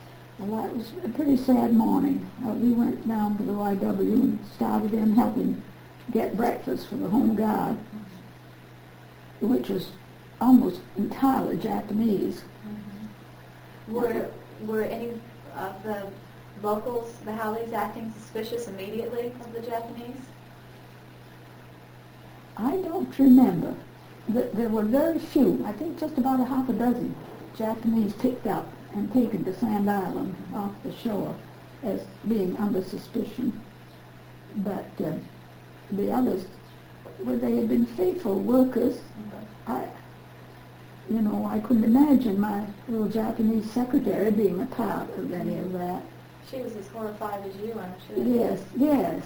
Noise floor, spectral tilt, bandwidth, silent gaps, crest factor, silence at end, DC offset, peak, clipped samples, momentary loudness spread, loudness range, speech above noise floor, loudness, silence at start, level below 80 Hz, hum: -48 dBFS; -7.5 dB/octave; over 20 kHz; none; 20 dB; 0 s; under 0.1%; -8 dBFS; under 0.1%; 19 LU; 9 LU; 22 dB; -26 LUFS; 0 s; -56 dBFS; none